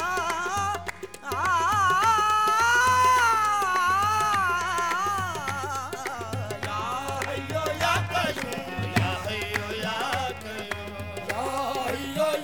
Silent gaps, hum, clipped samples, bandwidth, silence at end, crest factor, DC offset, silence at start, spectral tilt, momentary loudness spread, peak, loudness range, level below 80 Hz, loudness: none; none; under 0.1%; 19 kHz; 0 s; 18 dB; 0.3%; 0 s; -3.5 dB/octave; 12 LU; -8 dBFS; 8 LU; -52 dBFS; -25 LUFS